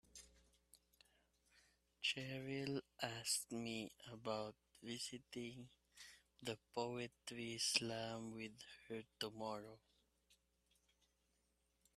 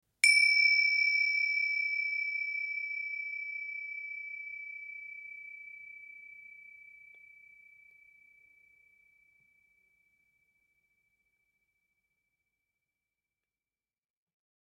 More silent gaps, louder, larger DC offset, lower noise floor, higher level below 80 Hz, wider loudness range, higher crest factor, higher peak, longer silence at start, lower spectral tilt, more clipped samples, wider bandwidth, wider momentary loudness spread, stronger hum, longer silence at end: neither; second, -46 LUFS vs -28 LUFS; neither; second, -83 dBFS vs under -90 dBFS; first, -80 dBFS vs -88 dBFS; second, 7 LU vs 25 LU; about the same, 30 dB vs 26 dB; second, -20 dBFS vs -10 dBFS; about the same, 0.15 s vs 0.25 s; first, -3 dB/octave vs 5.5 dB/octave; neither; second, 14.5 kHz vs 16 kHz; second, 19 LU vs 25 LU; neither; second, 1.65 s vs 7.9 s